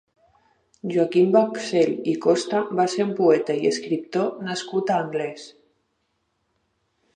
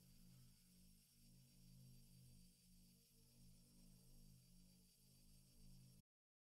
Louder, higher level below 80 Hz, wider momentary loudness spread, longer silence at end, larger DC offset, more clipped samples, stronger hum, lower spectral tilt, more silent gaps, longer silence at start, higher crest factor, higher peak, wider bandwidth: first, -22 LUFS vs -69 LUFS; about the same, -74 dBFS vs -74 dBFS; first, 9 LU vs 2 LU; first, 1.65 s vs 0.4 s; neither; neither; neither; about the same, -5.5 dB/octave vs -4.5 dB/octave; neither; first, 0.85 s vs 0 s; first, 18 dB vs 12 dB; first, -6 dBFS vs -56 dBFS; second, 10 kHz vs 15.5 kHz